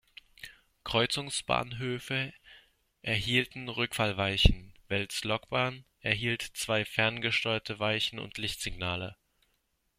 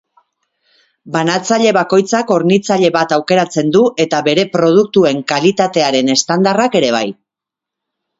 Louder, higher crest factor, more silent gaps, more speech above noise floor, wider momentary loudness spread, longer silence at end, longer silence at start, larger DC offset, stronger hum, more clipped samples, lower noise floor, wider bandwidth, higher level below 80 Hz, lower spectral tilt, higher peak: second, -31 LUFS vs -13 LUFS; first, 28 dB vs 14 dB; neither; second, 45 dB vs 72 dB; first, 11 LU vs 4 LU; second, 0.85 s vs 1.1 s; second, 0.4 s vs 1.05 s; neither; neither; neither; second, -76 dBFS vs -84 dBFS; first, 16 kHz vs 8 kHz; first, -42 dBFS vs -58 dBFS; about the same, -4 dB/octave vs -4.5 dB/octave; second, -4 dBFS vs 0 dBFS